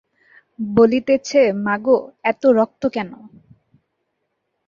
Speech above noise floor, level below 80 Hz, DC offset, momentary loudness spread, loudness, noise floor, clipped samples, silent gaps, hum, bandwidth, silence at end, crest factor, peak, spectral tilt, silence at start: 56 dB; -58 dBFS; under 0.1%; 10 LU; -17 LUFS; -74 dBFS; under 0.1%; none; none; 7.4 kHz; 1.4 s; 18 dB; -2 dBFS; -6 dB/octave; 0.6 s